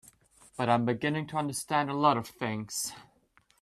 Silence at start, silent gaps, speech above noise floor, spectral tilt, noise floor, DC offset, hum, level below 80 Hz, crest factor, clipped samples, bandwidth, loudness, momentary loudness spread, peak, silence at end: 0.6 s; none; 37 dB; -4.5 dB/octave; -67 dBFS; under 0.1%; none; -68 dBFS; 20 dB; under 0.1%; 14 kHz; -30 LUFS; 9 LU; -12 dBFS; 0.6 s